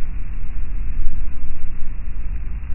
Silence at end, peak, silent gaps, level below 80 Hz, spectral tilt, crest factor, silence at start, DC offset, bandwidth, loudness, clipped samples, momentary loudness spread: 0 s; 0 dBFS; none; -22 dBFS; -11.5 dB/octave; 12 dB; 0 s; under 0.1%; 2.8 kHz; -32 LUFS; under 0.1%; 4 LU